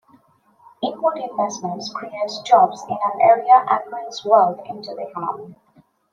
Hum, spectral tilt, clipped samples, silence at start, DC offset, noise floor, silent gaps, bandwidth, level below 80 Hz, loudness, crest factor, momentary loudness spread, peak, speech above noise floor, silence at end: none; -4 dB/octave; under 0.1%; 0.8 s; under 0.1%; -56 dBFS; none; 7.6 kHz; -74 dBFS; -19 LUFS; 18 dB; 16 LU; -2 dBFS; 38 dB; 0.6 s